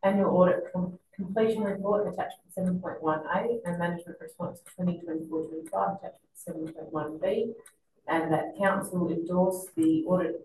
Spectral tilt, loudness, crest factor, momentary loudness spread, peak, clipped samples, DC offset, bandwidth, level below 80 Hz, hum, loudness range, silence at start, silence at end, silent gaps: -7 dB/octave; -29 LUFS; 18 dB; 14 LU; -10 dBFS; under 0.1%; under 0.1%; 12.5 kHz; -66 dBFS; none; 6 LU; 0.05 s; 0 s; none